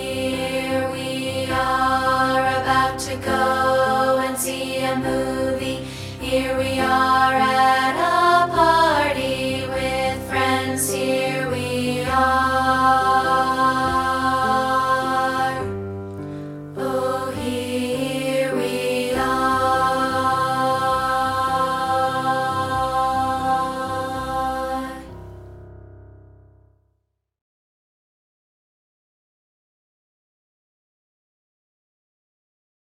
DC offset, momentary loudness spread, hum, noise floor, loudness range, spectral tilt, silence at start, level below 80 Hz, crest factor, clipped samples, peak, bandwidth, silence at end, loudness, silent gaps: under 0.1%; 9 LU; none; -72 dBFS; 7 LU; -4 dB/octave; 0 s; -44 dBFS; 18 dB; under 0.1%; -4 dBFS; 16.5 kHz; 6.8 s; -20 LUFS; none